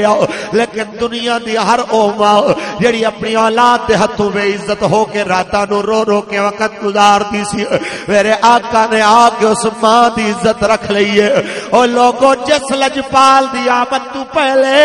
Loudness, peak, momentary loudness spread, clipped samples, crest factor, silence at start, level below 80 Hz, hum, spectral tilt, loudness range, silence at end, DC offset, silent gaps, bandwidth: -12 LUFS; 0 dBFS; 7 LU; 0.2%; 12 dB; 0 s; -44 dBFS; none; -4 dB/octave; 3 LU; 0 s; under 0.1%; none; 11.5 kHz